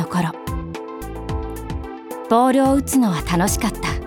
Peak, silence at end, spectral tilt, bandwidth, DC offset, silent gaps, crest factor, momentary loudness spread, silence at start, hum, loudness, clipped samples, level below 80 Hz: -4 dBFS; 0 s; -5.5 dB/octave; 19.5 kHz; under 0.1%; none; 16 dB; 15 LU; 0 s; none; -20 LUFS; under 0.1%; -32 dBFS